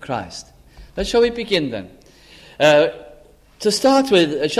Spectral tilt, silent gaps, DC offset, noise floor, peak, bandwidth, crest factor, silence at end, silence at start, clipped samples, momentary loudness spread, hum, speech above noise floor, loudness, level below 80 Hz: -4 dB/octave; none; under 0.1%; -47 dBFS; -2 dBFS; 14.5 kHz; 18 dB; 0 s; 0 s; under 0.1%; 19 LU; none; 30 dB; -17 LUFS; -44 dBFS